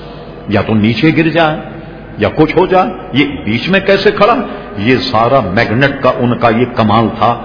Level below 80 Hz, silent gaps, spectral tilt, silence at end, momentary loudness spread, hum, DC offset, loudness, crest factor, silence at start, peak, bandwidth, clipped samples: -36 dBFS; none; -7.5 dB/octave; 0 s; 8 LU; none; under 0.1%; -11 LUFS; 12 dB; 0 s; 0 dBFS; 5.4 kHz; 0.5%